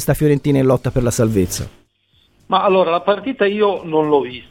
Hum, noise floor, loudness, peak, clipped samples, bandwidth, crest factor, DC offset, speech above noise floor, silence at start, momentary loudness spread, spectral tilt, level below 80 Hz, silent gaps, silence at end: none; -58 dBFS; -16 LUFS; -2 dBFS; under 0.1%; 17 kHz; 16 dB; under 0.1%; 42 dB; 0 s; 5 LU; -6 dB/octave; -38 dBFS; none; 0.1 s